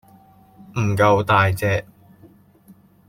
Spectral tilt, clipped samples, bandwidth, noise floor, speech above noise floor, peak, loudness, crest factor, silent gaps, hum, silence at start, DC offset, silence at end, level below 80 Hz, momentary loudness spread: -6.5 dB/octave; under 0.1%; 16 kHz; -51 dBFS; 33 dB; -2 dBFS; -19 LUFS; 18 dB; none; none; 0.75 s; under 0.1%; 1.25 s; -52 dBFS; 10 LU